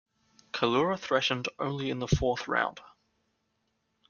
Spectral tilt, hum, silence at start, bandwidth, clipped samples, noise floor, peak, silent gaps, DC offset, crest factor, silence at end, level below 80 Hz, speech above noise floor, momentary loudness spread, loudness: -5 dB/octave; none; 0.55 s; 7.2 kHz; under 0.1%; -77 dBFS; -10 dBFS; none; under 0.1%; 22 dB; 1.2 s; -50 dBFS; 48 dB; 6 LU; -29 LUFS